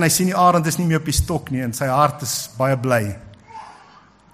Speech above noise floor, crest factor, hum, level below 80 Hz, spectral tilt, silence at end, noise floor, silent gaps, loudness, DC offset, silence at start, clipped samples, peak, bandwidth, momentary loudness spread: 30 dB; 18 dB; none; -36 dBFS; -4.5 dB/octave; 0.6 s; -49 dBFS; none; -19 LUFS; under 0.1%; 0 s; under 0.1%; -2 dBFS; 15.5 kHz; 23 LU